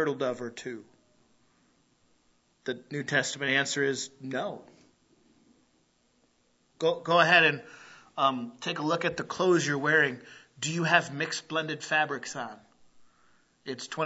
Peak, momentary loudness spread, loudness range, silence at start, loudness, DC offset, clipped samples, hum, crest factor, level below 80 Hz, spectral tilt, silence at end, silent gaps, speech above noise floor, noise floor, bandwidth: -6 dBFS; 17 LU; 9 LU; 0 s; -28 LUFS; under 0.1%; under 0.1%; none; 24 dB; -76 dBFS; -3.5 dB/octave; 0 s; none; 41 dB; -69 dBFS; 8.2 kHz